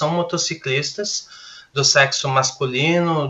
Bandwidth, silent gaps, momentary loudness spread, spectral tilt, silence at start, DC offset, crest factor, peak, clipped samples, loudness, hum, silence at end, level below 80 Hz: 8.4 kHz; none; 12 LU; -3 dB/octave; 0 s; under 0.1%; 20 dB; 0 dBFS; under 0.1%; -18 LUFS; none; 0 s; -62 dBFS